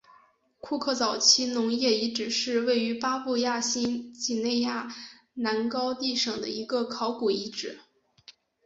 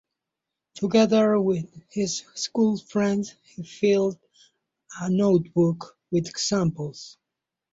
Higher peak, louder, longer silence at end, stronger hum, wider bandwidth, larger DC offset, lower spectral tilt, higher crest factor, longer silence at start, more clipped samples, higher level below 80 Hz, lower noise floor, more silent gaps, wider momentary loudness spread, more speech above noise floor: about the same, -6 dBFS vs -8 dBFS; second, -27 LUFS vs -24 LUFS; second, 0.35 s vs 0.6 s; neither; about the same, 8 kHz vs 8 kHz; neither; second, -2 dB/octave vs -5.5 dB/octave; about the same, 22 dB vs 18 dB; about the same, 0.65 s vs 0.75 s; neither; second, -70 dBFS vs -62 dBFS; second, -61 dBFS vs -86 dBFS; neither; second, 12 LU vs 16 LU; second, 33 dB vs 62 dB